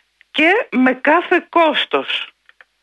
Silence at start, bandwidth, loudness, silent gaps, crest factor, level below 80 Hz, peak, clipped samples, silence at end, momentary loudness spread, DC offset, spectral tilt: 0.35 s; 9.6 kHz; -15 LUFS; none; 16 dB; -68 dBFS; -2 dBFS; under 0.1%; 0.55 s; 9 LU; under 0.1%; -4.5 dB/octave